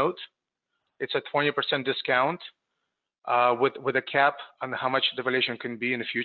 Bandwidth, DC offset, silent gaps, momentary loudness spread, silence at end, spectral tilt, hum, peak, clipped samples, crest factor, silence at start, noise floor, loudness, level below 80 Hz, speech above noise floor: 4.9 kHz; under 0.1%; none; 14 LU; 0 s; -7.5 dB/octave; none; -8 dBFS; under 0.1%; 18 dB; 0 s; -83 dBFS; -26 LUFS; -78 dBFS; 56 dB